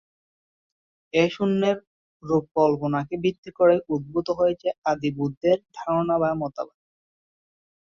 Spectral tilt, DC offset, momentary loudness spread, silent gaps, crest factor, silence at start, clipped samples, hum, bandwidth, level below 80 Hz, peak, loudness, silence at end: -7 dB/octave; under 0.1%; 7 LU; 1.87-2.20 s, 2.51-2.55 s, 3.38-3.43 s, 4.78-4.82 s, 5.37-5.41 s; 18 dB; 1.15 s; under 0.1%; none; 7.2 kHz; -60 dBFS; -6 dBFS; -24 LUFS; 1.2 s